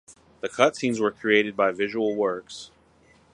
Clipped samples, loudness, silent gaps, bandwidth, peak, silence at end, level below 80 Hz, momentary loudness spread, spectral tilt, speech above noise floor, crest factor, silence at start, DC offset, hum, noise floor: under 0.1%; -24 LUFS; none; 11 kHz; -2 dBFS; 0.65 s; -66 dBFS; 14 LU; -4.5 dB/octave; 34 dB; 24 dB; 0.1 s; under 0.1%; none; -58 dBFS